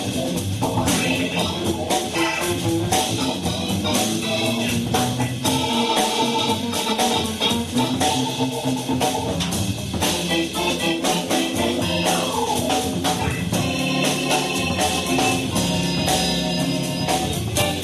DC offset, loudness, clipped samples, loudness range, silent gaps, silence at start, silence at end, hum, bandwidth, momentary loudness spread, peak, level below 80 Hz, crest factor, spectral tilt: under 0.1%; -21 LUFS; under 0.1%; 1 LU; none; 0 s; 0 s; none; 13.5 kHz; 3 LU; -6 dBFS; -44 dBFS; 16 dB; -3.5 dB/octave